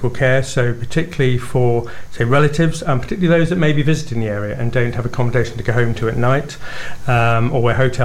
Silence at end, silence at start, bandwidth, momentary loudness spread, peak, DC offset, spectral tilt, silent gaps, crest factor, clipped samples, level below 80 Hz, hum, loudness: 0 s; 0 s; 13 kHz; 7 LU; -2 dBFS; 4%; -6.5 dB/octave; none; 14 dB; under 0.1%; -34 dBFS; none; -17 LUFS